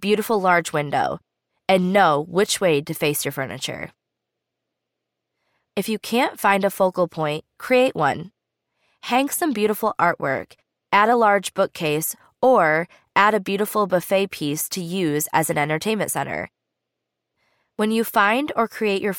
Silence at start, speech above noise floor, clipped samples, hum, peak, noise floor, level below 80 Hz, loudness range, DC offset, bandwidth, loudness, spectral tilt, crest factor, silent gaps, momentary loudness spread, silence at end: 0 s; 61 dB; under 0.1%; none; -2 dBFS; -81 dBFS; -64 dBFS; 5 LU; under 0.1%; 19 kHz; -21 LUFS; -4 dB/octave; 20 dB; none; 11 LU; 0 s